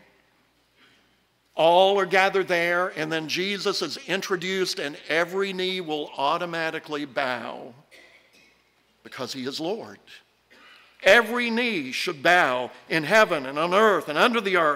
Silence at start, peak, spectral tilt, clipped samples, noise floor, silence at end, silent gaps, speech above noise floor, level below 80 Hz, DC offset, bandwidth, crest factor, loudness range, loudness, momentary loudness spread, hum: 1.55 s; -6 dBFS; -3.5 dB/octave; under 0.1%; -65 dBFS; 0 s; none; 42 dB; -70 dBFS; under 0.1%; 16 kHz; 20 dB; 11 LU; -23 LUFS; 13 LU; none